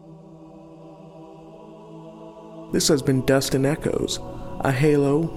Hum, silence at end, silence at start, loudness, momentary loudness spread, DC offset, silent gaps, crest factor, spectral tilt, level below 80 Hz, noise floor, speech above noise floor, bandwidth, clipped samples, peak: none; 0 s; 0.05 s; -21 LUFS; 24 LU; under 0.1%; none; 18 dB; -5 dB/octave; -46 dBFS; -44 dBFS; 23 dB; 16.5 kHz; under 0.1%; -6 dBFS